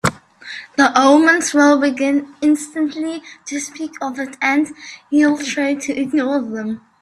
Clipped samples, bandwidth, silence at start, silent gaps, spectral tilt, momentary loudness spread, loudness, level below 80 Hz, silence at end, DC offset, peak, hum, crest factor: under 0.1%; 12.5 kHz; 0.05 s; none; -4 dB/octave; 15 LU; -17 LUFS; -58 dBFS; 0.25 s; under 0.1%; 0 dBFS; none; 16 dB